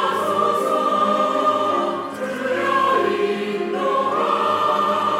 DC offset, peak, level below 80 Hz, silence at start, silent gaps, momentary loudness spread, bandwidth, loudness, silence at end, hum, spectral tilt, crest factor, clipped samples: under 0.1%; -6 dBFS; -70 dBFS; 0 s; none; 6 LU; 16.5 kHz; -20 LUFS; 0 s; none; -4.5 dB/octave; 14 dB; under 0.1%